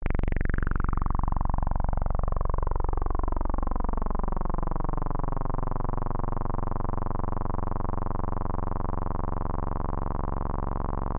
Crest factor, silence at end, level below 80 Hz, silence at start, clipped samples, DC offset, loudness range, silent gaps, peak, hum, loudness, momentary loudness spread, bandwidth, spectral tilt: 12 dB; 0 s; -28 dBFS; 0 s; under 0.1%; 1%; 2 LU; none; -14 dBFS; none; -32 LUFS; 2 LU; 2.7 kHz; -12.5 dB/octave